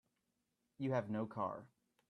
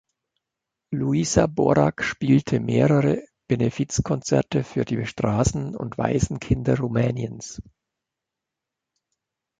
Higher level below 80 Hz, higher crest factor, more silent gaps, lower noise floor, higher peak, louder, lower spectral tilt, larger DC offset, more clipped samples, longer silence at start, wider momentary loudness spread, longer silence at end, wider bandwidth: second, -82 dBFS vs -42 dBFS; about the same, 18 dB vs 20 dB; neither; about the same, -86 dBFS vs -86 dBFS; second, -26 dBFS vs -4 dBFS; second, -42 LUFS vs -23 LUFS; first, -8.5 dB/octave vs -6 dB/octave; neither; neither; about the same, 0.8 s vs 0.9 s; second, 6 LU vs 10 LU; second, 0.45 s vs 2 s; about the same, 9.2 kHz vs 9.4 kHz